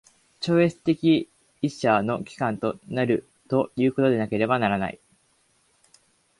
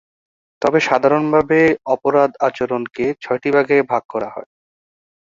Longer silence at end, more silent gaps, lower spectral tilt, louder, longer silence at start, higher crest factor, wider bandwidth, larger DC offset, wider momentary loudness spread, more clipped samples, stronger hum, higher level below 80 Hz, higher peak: first, 1.45 s vs 0.75 s; second, none vs 4.05-4.09 s; about the same, -7 dB/octave vs -6 dB/octave; second, -24 LUFS vs -17 LUFS; second, 0.4 s vs 0.6 s; about the same, 18 dB vs 16 dB; first, 11.5 kHz vs 7.6 kHz; neither; about the same, 8 LU vs 8 LU; neither; neither; about the same, -60 dBFS vs -56 dBFS; second, -6 dBFS vs -2 dBFS